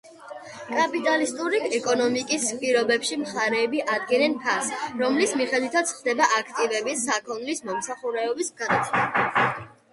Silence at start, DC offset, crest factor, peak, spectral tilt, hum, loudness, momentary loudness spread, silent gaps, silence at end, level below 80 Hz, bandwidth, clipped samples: 0.05 s; under 0.1%; 18 dB; -6 dBFS; -2.5 dB/octave; none; -24 LUFS; 8 LU; none; 0.25 s; -68 dBFS; 11.5 kHz; under 0.1%